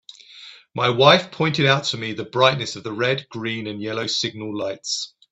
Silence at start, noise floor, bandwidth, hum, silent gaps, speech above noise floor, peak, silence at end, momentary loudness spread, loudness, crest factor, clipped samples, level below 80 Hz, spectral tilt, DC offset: 0.3 s; -44 dBFS; 8.4 kHz; none; none; 23 dB; 0 dBFS; 0.25 s; 13 LU; -21 LUFS; 22 dB; under 0.1%; -62 dBFS; -4 dB/octave; under 0.1%